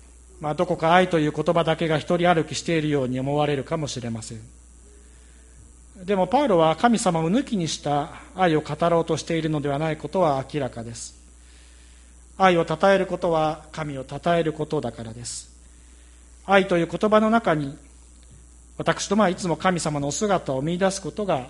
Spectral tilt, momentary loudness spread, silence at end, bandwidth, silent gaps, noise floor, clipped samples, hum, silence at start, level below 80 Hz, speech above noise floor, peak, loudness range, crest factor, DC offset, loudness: -5.5 dB/octave; 14 LU; 0 s; 11.5 kHz; none; -48 dBFS; under 0.1%; none; 0.35 s; -48 dBFS; 26 dB; -2 dBFS; 5 LU; 22 dB; under 0.1%; -23 LUFS